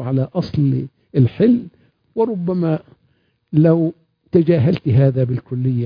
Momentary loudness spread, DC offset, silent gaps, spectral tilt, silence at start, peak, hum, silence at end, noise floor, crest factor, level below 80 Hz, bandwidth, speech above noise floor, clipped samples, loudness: 8 LU; under 0.1%; none; -11 dB/octave; 0 s; -2 dBFS; none; 0 s; -62 dBFS; 14 dB; -50 dBFS; 5.2 kHz; 46 dB; under 0.1%; -18 LUFS